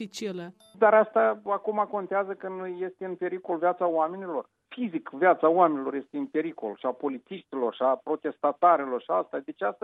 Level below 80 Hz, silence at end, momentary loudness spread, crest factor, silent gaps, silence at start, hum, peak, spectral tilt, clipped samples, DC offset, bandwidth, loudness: -86 dBFS; 0.1 s; 14 LU; 20 dB; none; 0 s; none; -6 dBFS; -6 dB/octave; under 0.1%; under 0.1%; 8.8 kHz; -27 LUFS